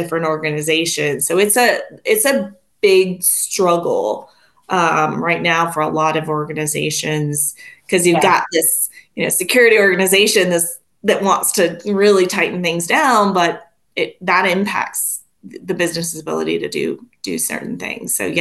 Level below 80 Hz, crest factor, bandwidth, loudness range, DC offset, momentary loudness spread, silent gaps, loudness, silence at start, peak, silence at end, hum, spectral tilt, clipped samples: -62 dBFS; 16 dB; 13 kHz; 6 LU; under 0.1%; 10 LU; none; -16 LUFS; 0 s; -2 dBFS; 0 s; none; -3 dB/octave; under 0.1%